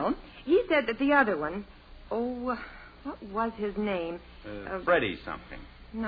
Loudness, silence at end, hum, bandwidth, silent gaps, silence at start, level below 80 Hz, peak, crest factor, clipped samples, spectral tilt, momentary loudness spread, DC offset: -29 LUFS; 0 s; none; 5 kHz; none; 0 s; -52 dBFS; -10 dBFS; 20 dB; under 0.1%; -8 dB/octave; 19 LU; under 0.1%